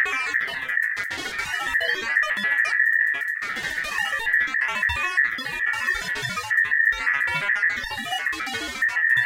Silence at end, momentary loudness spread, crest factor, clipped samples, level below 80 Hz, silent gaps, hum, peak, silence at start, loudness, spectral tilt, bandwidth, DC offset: 0 s; 8 LU; 16 dB; under 0.1%; -52 dBFS; none; none; -8 dBFS; 0 s; -22 LUFS; -1.5 dB/octave; 17 kHz; under 0.1%